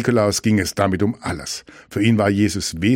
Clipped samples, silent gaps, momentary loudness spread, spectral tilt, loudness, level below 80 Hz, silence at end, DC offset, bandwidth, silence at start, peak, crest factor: under 0.1%; none; 11 LU; -5 dB/octave; -19 LUFS; -44 dBFS; 0 s; under 0.1%; 16.5 kHz; 0 s; -2 dBFS; 16 dB